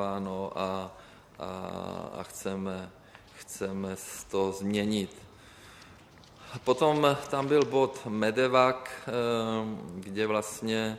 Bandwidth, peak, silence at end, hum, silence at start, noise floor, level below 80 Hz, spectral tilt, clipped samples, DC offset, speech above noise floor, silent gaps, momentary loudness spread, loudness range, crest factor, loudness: 15.5 kHz; -8 dBFS; 0 s; none; 0 s; -54 dBFS; -64 dBFS; -5 dB/octave; under 0.1%; under 0.1%; 24 dB; none; 18 LU; 11 LU; 22 dB; -30 LUFS